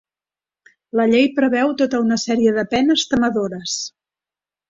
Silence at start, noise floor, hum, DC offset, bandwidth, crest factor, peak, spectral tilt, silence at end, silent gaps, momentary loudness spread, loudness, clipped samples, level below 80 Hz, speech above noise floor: 0.95 s; under -90 dBFS; 50 Hz at -50 dBFS; under 0.1%; 7.8 kHz; 16 dB; -4 dBFS; -4 dB/octave; 0.8 s; none; 9 LU; -18 LUFS; under 0.1%; -54 dBFS; over 73 dB